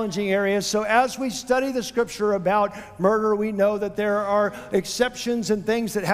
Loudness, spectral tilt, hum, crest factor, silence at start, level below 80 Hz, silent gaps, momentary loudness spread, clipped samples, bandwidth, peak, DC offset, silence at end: -23 LUFS; -4.5 dB/octave; none; 18 dB; 0 s; -54 dBFS; none; 5 LU; under 0.1%; 16 kHz; -4 dBFS; under 0.1%; 0 s